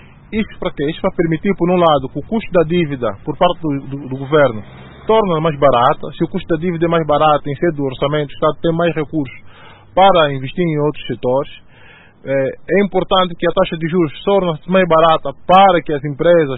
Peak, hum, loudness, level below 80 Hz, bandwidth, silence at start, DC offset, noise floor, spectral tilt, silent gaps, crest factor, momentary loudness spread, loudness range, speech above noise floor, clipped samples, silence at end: 0 dBFS; none; -15 LUFS; -40 dBFS; 4.1 kHz; 0.3 s; under 0.1%; -42 dBFS; -9.5 dB/octave; none; 16 dB; 10 LU; 4 LU; 28 dB; under 0.1%; 0 s